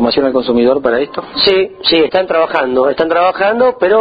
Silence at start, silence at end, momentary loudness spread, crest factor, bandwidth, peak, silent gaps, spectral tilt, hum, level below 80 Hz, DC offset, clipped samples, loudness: 0 s; 0 s; 3 LU; 12 dB; 5 kHz; 0 dBFS; none; -6.5 dB/octave; none; -46 dBFS; under 0.1%; under 0.1%; -12 LUFS